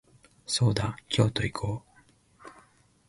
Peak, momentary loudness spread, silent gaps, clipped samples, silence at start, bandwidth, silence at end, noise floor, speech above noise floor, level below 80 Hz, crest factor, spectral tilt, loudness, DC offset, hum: -10 dBFS; 11 LU; none; under 0.1%; 0.5 s; 11.5 kHz; 0.6 s; -61 dBFS; 34 dB; -50 dBFS; 22 dB; -5 dB/octave; -28 LUFS; under 0.1%; none